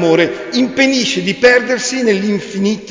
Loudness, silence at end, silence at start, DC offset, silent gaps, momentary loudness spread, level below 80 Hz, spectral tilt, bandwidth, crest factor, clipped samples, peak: -13 LUFS; 0 s; 0 s; under 0.1%; none; 7 LU; -52 dBFS; -4 dB/octave; 7.6 kHz; 14 dB; under 0.1%; 0 dBFS